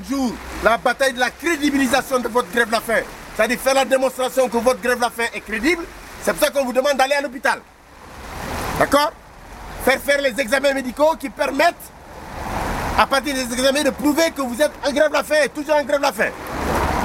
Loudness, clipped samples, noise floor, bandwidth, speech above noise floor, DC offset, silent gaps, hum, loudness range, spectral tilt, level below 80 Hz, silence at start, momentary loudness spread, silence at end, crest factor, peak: -19 LUFS; under 0.1%; -40 dBFS; 16.5 kHz; 21 dB; under 0.1%; none; none; 2 LU; -3.5 dB/octave; -40 dBFS; 0 s; 9 LU; 0 s; 20 dB; 0 dBFS